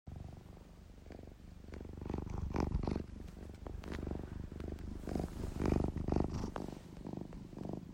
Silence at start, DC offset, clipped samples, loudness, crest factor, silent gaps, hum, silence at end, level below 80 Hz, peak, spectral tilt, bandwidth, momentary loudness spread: 0.05 s; under 0.1%; under 0.1%; -42 LUFS; 22 dB; none; none; 0 s; -48 dBFS; -20 dBFS; -8 dB/octave; 16 kHz; 17 LU